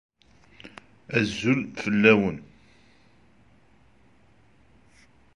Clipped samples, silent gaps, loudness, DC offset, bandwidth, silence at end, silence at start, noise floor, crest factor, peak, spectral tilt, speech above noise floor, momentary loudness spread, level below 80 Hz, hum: under 0.1%; none; -23 LUFS; under 0.1%; 10.5 kHz; 2.95 s; 0.65 s; -60 dBFS; 26 dB; -4 dBFS; -6 dB/octave; 38 dB; 28 LU; -60 dBFS; none